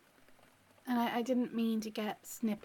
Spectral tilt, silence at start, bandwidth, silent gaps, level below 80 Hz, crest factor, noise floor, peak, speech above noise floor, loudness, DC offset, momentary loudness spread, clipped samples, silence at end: -5 dB/octave; 0.3 s; 17.5 kHz; none; -80 dBFS; 14 dB; -65 dBFS; -22 dBFS; 29 dB; -36 LUFS; under 0.1%; 7 LU; under 0.1%; 0.05 s